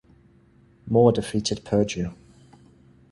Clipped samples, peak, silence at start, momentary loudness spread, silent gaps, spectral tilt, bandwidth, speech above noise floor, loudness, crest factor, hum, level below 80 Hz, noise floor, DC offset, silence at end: under 0.1%; -4 dBFS; 0.85 s; 11 LU; none; -6 dB/octave; 11.5 kHz; 35 dB; -23 LUFS; 22 dB; none; -50 dBFS; -56 dBFS; under 0.1%; 1 s